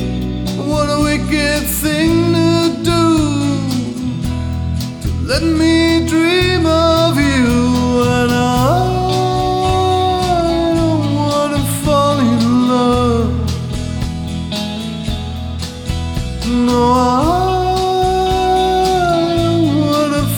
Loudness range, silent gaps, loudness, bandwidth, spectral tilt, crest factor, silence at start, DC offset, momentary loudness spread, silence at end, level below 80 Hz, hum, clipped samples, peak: 4 LU; none; -14 LUFS; 18 kHz; -5.5 dB/octave; 12 dB; 0 s; under 0.1%; 9 LU; 0 s; -28 dBFS; none; under 0.1%; -2 dBFS